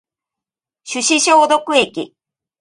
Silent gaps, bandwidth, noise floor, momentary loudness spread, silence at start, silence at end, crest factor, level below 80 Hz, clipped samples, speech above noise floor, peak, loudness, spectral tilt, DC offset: none; 11.5 kHz; -87 dBFS; 16 LU; 0.85 s; 0.55 s; 18 dB; -64 dBFS; under 0.1%; 73 dB; 0 dBFS; -14 LUFS; -1 dB/octave; under 0.1%